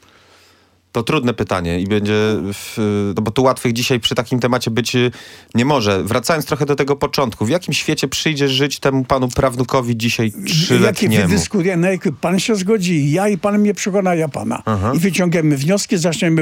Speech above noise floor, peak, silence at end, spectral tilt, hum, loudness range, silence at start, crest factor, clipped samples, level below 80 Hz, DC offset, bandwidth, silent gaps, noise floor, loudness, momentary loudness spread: 37 dB; 0 dBFS; 0 s; -5 dB/octave; none; 2 LU; 0.95 s; 16 dB; under 0.1%; -44 dBFS; under 0.1%; 17 kHz; none; -53 dBFS; -17 LUFS; 4 LU